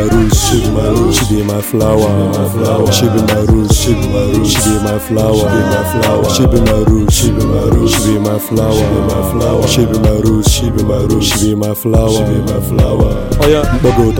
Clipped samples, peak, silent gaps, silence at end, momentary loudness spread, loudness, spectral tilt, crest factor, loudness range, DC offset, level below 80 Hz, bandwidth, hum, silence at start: under 0.1%; 0 dBFS; none; 0 s; 3 LU; -11 LUFS; -5.5 dB/octave; 10 dB; 1 LU; under 0.1%; -20 dBFS; 17.5 kHz; none; 0 s